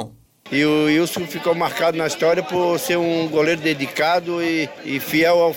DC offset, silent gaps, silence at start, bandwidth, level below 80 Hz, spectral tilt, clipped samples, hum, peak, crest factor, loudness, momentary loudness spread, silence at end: under 0.1%; none; 0 s; 17 kHz; -60 dBFS; -4.5 dB/octave; under 0.1%; none; -6 dBFS; 12 dB; -19 LUFS; 7 LU; 0 s